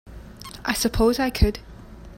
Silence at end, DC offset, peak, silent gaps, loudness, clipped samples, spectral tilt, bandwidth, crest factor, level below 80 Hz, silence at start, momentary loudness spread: 0 s; under 0.1%; -4 dBFS; none; -22 LUFS; under 0.1%; -5 dB/octave; 16.5 kHz; 20 dB; -32 dBFS; 0.05 s; 21 LU